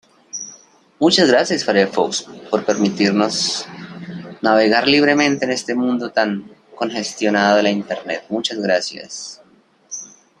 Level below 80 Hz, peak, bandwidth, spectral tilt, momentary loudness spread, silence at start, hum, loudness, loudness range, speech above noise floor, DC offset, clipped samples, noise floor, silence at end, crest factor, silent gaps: -62 dBFS; 0 dBFS; 11 kHz; -3.5 dB/octave; 18 LU; 0.35 s; none; -17 LUFS; 3 LU; 36 dB; under 0.1%; under 0.1%; -53 dBFS; 0.35 s; 18 dB; none